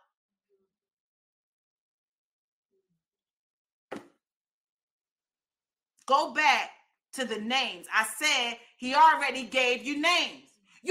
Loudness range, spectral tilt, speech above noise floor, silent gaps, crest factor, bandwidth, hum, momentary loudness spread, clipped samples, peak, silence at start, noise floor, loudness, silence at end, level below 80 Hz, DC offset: 5 LU; -0.5 dB/octave; over 63 dB; 4.36-4.45 s, 4.51-4.99 s, 5.11-5.16 s; 22 dB; 16 kHz; none; 19 LU; under 0.1%; -10 dBFS; 3.9 s; under -90 dBFS; -26 LUFS; 0 s; -80 dBFS; under 0.1%